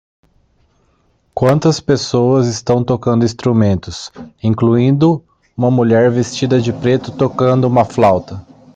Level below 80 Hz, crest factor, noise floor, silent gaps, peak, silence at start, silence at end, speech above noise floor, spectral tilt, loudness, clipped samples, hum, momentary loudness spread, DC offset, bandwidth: -48 dBFS; 12 dB; -58 dBFS; none; -2 dBFS; 1.35 s; 0.35 s; 45 dB; -7 dB/octave; -14 LUFS; under 0.1%; none; 10 LU; under 0.1%; 9 kHz